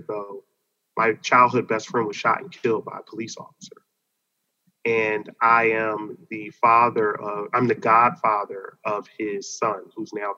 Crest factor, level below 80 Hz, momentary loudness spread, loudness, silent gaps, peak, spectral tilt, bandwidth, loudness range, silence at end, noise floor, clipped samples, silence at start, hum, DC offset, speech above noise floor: 22 dB; -80 dBFS; 17 LU; -22 LUFS; none; -2 dBFS; -5 dB/octave; 7.8 kHz; 7 LU; 0 s; -77 dBFS; under 0.1%; 0.1 s; none; under 0.1%; 54 dB